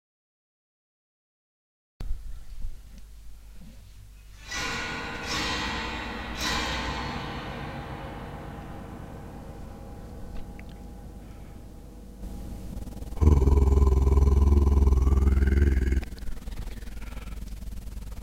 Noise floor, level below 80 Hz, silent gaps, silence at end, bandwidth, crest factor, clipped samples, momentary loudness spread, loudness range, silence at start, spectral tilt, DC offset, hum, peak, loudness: -47 dBFS; -28 dBFS; none; 0 s; 13 kHz; 22 dB; under 0.1%; 22 LU; 22 LU; 2 s; -5.5 dB/octave; under 0.1%; none; -6 dBFS; -26 LUFS